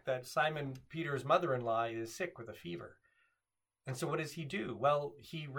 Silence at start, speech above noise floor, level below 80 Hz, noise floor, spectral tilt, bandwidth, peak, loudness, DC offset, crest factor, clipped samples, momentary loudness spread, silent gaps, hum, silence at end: 0.05 s; 52 dB; -76 dBFS; -89 dBFS; -5.5 dB/octave; 19 kHz; -16 dBFS; -37 LUFS; under 0.1%; 22 dB; under 0.1%; 14 LU; none; none; 0 s